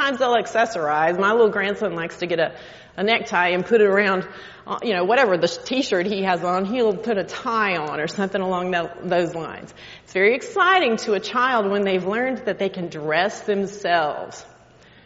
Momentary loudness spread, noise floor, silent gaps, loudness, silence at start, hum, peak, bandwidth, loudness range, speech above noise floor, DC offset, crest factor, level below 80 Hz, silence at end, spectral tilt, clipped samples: 11 LU; -50 dBFS; none; -21 LUFS; 0 s; none; -4 dBFS; 8 kHz; 3 LU; 29 dB; under 0.1%; 18 dB; -60 dBFS; 0.6 s; -2.5 dB/octave; under 0.1%